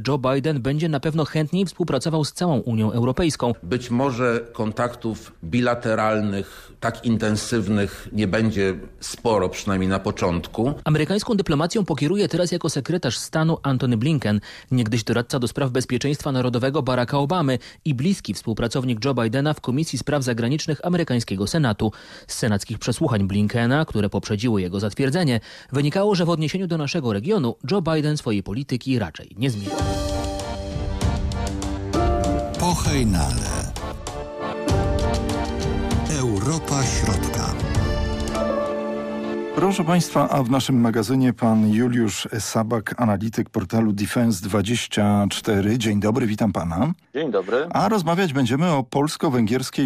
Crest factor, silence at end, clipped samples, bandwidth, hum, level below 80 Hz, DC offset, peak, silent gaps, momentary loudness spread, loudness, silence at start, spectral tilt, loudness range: 12 dB; 0 s; under 0.1%; 15.5 kHz; none; -36 dBFS; under 0.1%; -10 dBFS; none; 6 LU; -22 LUFS; 0 s; -6 dB/octave; 3 LU